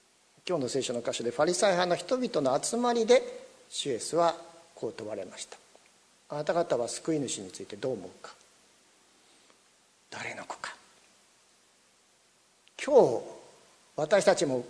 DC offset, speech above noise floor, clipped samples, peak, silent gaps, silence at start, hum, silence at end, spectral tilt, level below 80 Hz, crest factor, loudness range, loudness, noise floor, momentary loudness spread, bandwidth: under 0.1%; 37 dB; under 0.1%; -8 dBFS; none; 0.45 s; 60 Hz at -60 dBFS; 0 s; -3.5 dB/octave; -74 dBFS; 24 dB; 17 LU; -29 LUFS; -65 dBFS; 20 LU; 11 kHz